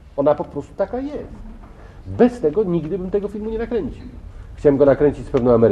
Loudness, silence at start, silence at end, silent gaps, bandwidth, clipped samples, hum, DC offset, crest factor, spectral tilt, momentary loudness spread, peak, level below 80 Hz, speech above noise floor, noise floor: -19 LUFS; 0.05 s; 0 s; none; 9 kHz; under 0.1%; none; under 0.1%; 18 dB; -9 dB/octave; 22 LU; -2 dBFS; -38 dBFS; 21 dB; -39 dBFS